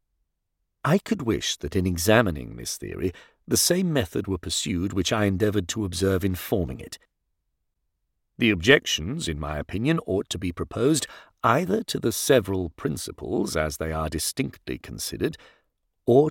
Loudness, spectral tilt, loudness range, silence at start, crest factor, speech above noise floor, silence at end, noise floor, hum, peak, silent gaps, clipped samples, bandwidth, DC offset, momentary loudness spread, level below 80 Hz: -25 LUFS; -4.5 dB/octave; 3 LU; 0.85 s; 22 dB; 53 dB; 0 s; -78 dBFS; none; -4 dBFS; none; under 0.1%; 17 kHz; under 0.1%; 11 LU; -46 dBFS